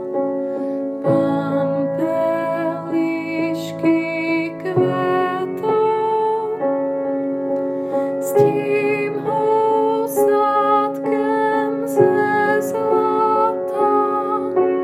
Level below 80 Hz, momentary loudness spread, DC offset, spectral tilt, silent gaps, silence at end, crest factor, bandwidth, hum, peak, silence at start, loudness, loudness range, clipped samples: -72 dBFS; 6 LU; under 0.1%; -6.5 dB/octave; none; 0 s; 16 dB; 15.5 kHz; none; -2 dBFS; 0 s; -19 LUFS; 3 LU; under 0.1%